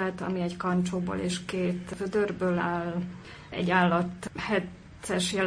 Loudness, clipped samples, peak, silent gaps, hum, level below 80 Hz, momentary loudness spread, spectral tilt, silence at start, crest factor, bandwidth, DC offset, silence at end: -29 LUFS; under 0.1%; -10 dBFS; none; none; -56 dBFS; 11 LU; -5.5 dB/octave; 0 s; 20 dB; 10.5 kHz; under 0.1%; 0 s